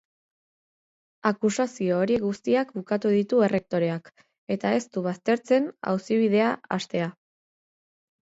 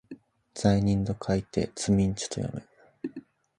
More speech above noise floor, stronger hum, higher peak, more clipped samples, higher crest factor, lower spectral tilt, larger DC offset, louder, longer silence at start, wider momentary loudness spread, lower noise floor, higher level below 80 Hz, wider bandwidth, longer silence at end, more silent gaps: first, over 66 dB vs 23 dB; neither; about the same, -6 dBFS vs -8 dBFS; neither; about the same, 20 dB vs 20 dB; about the same, -6 dB/octave vs -6 dB/octave; neither; first, -25 LUFS vs -28 LUFS; first, 1.25 s vs 0.1 s; second, 7 LU vs 20 LU; first, under -90 dBFS vs -49 dBFS; second, -68 dBFS vs -48 dBFS; second, 8 kHz vs 11 kHz; first, 1.15 s vs 0.4 s; first, 4.38-4.47 s vs none